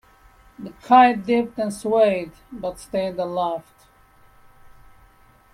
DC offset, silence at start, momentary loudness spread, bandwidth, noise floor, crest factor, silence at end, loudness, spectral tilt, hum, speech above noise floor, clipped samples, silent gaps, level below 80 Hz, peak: under 0.1%; 0.6 s; 21 LU; 14 kHz; -54 dBFS; 20 dB; 1.95 s; -20 LUFS; -5.5 dB/octave; none; 33 dB; under 0.1%; none; -56 dBFS; -2 dBFS